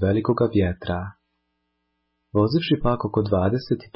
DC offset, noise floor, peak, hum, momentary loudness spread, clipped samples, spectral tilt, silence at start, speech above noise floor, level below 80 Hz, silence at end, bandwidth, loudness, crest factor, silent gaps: under 0.1%; -74 dBFS; -8 dBFS; none; 8 LU; under 0.1%; -11.5 dB/octave; 0 s; 53 dB; -40 dBFS; 0.1 s; 5.8 kHz; -23 LUFS; 16 dB; none